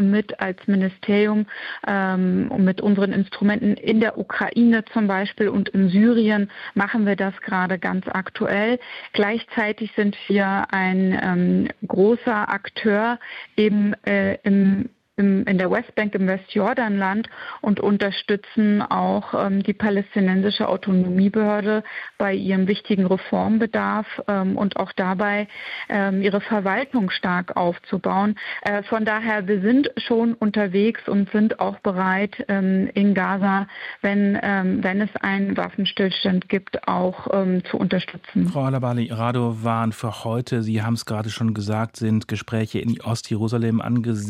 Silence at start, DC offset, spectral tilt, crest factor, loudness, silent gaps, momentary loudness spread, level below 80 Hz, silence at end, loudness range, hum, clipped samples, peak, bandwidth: 0 s; under 0.1%; -7.5 dB/octave; 14 dB; -21 LUFS; none; 6 LU; -60 dBFS; 0 s; 3 LU; none; under 0.1%; -6 dBFS; 10 kHz